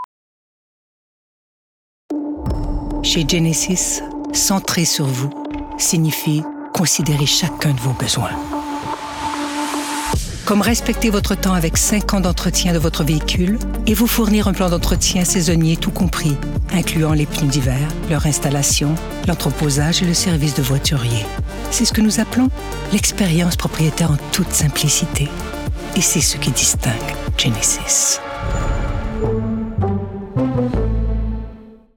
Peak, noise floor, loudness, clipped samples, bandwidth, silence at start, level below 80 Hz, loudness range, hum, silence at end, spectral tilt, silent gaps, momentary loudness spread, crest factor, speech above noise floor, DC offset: -2 dBFS; under -90 dBFS; -17 LUFS; under 0.1%; 19 kHz; 0 s; -28 dBFS; 4 LU; none; 0.2 s; -4 dB/octave; 0.04-2.09 s; 9 LU; 16 dB; over 73 dB; under 0.1%